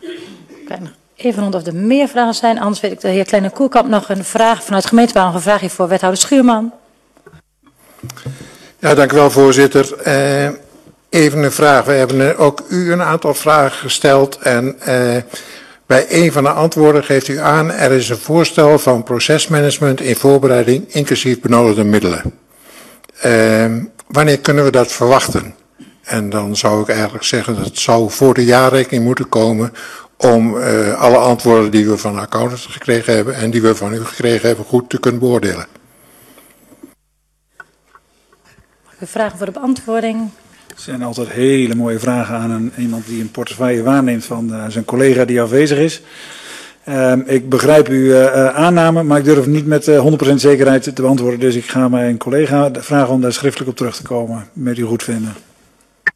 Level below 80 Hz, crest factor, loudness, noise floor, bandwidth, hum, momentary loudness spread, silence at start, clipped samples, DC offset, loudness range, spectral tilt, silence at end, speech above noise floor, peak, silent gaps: -50 dBFS; 14 dB; -13 LUFS; -63 dBFS; 14 kHz; none; 12 LU; 0.05 s; under 0.1%; under 0.1%; 6 LU; -5 dB/octave; 0.05 s; 50 dB; 0 dBFS; none